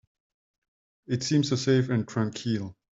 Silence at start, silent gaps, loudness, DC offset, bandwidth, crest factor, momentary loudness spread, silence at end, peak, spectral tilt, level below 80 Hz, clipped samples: 1.1 s; none; -27 LUFS; under 0.1%; 7.8 kHz; 18 dB; 7 LU; 0.25 s; -10 dBFS; -6 dB/octave; -66 dBFS; under 0.1%